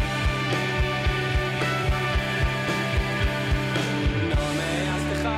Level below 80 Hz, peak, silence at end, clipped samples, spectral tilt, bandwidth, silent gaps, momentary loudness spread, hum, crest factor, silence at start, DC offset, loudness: -30 dBFS; -14 dBFS; 0 s; under 0.1%; -5.5 dB/octave; 15.5 kHz; none; 1 LU; none; 10 dB; 0 s; under 0.1%; -25 LUFS